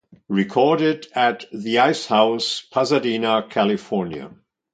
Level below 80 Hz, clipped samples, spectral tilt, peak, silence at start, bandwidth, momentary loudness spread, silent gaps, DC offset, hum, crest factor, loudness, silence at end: -64 dBFS; under 0.1%; -5 dB/octave; -2 dBFS; 0.3 s; 9.4 kHz; 8 LU; none; under 0.1%; none; 20 dB; -20 LUFS; 0.45 s